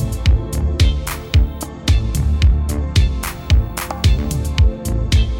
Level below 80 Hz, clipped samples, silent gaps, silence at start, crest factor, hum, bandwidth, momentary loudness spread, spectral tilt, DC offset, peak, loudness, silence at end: -18 dBFS; under 0.1%; none; 0 s; 12 dB; none; 17 kHz; 6 LU; -5.5 dB/octave; under 0.1%; -4 dBFS; -18 LUFS; 0 s